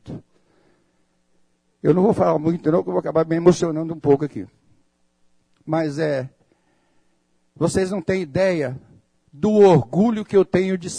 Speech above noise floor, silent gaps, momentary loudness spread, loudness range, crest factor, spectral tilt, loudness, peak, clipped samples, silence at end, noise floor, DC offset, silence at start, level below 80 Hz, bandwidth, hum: 46 dB; none; 13 LU; 7 LU; 18 dB; -7 dB/octave; -19 LUFS; -2 dBFS; under 0.1%; 0 s; -64 dBFS; under 0.1%; 0.05 s; -54 dBFS; 10.5 kHz; none